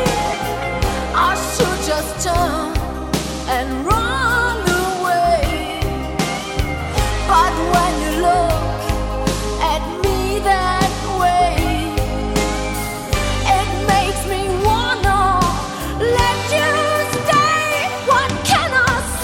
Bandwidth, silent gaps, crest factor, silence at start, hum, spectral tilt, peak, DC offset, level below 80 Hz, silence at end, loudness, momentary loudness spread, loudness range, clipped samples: 17 kHz; none; 16 dB; 0 s; none; -4 dB/octave; -2 dBFS; under 0.1%; -26 dBFS; 0 s; -17 LUFS; 7 LU; 3 LU; under 0.1%